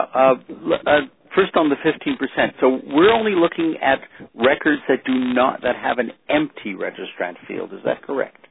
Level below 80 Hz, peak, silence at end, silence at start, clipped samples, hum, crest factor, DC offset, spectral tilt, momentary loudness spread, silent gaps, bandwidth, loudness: -56 dBFS; -2 dBFS; 0.2 s; 0 s; under 0.1%; none; 18 dB; under 0.1%; -9 dB/octave; 11 LU; none; 4.1 kHz; -20 LUFS